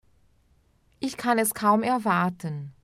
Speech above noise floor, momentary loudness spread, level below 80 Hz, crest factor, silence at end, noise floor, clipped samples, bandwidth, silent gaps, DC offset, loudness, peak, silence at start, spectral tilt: 39 dB; 12 LU; -64 dBFS; 18 dB; 0.15 s; -63 dBFS; under 0.1%; 16 kHz; none; under 0.1%; -25 LUFS; -10 dBFS; 1 s; -5 dB/octave